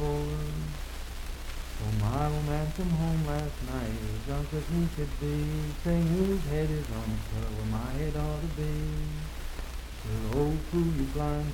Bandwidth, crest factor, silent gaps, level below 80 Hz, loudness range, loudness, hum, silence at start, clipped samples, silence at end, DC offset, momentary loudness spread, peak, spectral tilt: 17.5 kHz; 16 dB; none; -36 dBFS; 3 LU; -32 LUFS; none; 0 s; under 0.1%; 0 s; under 0.1%; 11 LU; -14 dBFS; -7 dB/octave